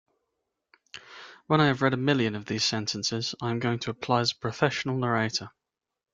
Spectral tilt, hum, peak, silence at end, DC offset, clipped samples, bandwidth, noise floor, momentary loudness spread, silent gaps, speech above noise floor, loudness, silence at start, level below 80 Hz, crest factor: -4.5 dB/octave; none; -6 dBFS; 0.65 s; under 0.1%; under 0.1%; 9.2 kHz; -81 dBFS; 21 LU; none; 55 dB; -27 LUFS; 0.95 s; -64 dBFS; 22 dB